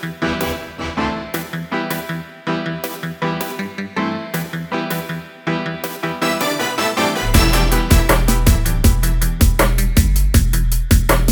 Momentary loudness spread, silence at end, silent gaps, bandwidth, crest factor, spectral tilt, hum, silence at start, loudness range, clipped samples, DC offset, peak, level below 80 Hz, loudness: 10 LU; 0 s; none; over 20 kHz; 16 dB; -4.5 dB/octave; none; 0 s; 8 LU; under 0.1%; under 0.1%; 0 dBFS; -20 dBFS; -18 LUFS